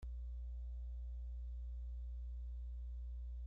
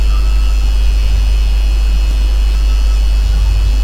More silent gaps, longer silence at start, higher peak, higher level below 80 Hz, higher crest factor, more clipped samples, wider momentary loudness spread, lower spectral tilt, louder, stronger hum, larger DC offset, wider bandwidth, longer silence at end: neither; about the same, 0 s vs 0 s; second, -42 dBFS vs -2 dBFS; second, -46 dBFS vs -10 dBFS; about the same, 4 dB vs 8 dB; neither; about the same, 0 LU vs 1 LU; first, -9.5 dB/octave vs -5 dB/octave; second, -50 LUFS vs -15 LUFS; first, 60 Hz at -45 dBFS vs none; neither; second, 0.8 kHz vs 9.6 kHz; about the same, 0 s vs 0 s